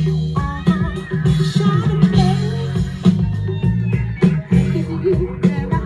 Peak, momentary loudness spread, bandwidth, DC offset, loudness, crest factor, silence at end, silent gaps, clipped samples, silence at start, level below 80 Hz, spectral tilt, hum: -2 dBFS; 6 LU; 10 kHz; under 0.1%; -17 LUFS; 16 dB; 0 s; none; under 0.1%; 0 s; -32 dBFS; -8 dB/octave; none